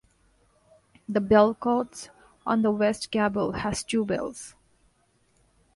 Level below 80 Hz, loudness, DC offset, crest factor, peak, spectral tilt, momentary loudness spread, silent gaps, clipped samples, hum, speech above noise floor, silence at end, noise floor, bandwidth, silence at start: -54 dBFS; -25 LUFS; under 0.1%; 22 dB; -6 dBFS; -5 dB/octave; 22 LU; none; under 0.1%; none; 42 dB; 1.25 s; -66 dBFS; 11.5 kHz; 1.1 s